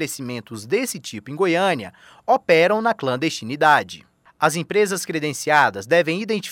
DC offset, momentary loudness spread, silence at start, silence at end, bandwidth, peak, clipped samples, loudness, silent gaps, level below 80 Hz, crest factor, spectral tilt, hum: under 0.1%; 15 LU; 0 s; 0 s; 17 kHz; -2 dBFS; under 0.1%; -20 LUFS; none; -68 dBFS; 18 dB; -4 dB/octave; none